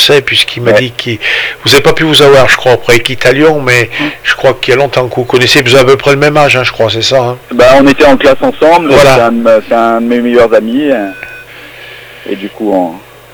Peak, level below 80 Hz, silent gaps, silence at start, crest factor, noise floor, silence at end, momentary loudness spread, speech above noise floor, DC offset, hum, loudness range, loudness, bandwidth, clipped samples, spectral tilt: 0 dBFS; -34 dBFS; none; 0 s; 8 dB; -29 dBFS; 0.35 s; 12 LU; 22 dB; under 0.1%; none; 4 LU; -6 LUFS; over 20 kHz; 6%; -4.5 dB/octave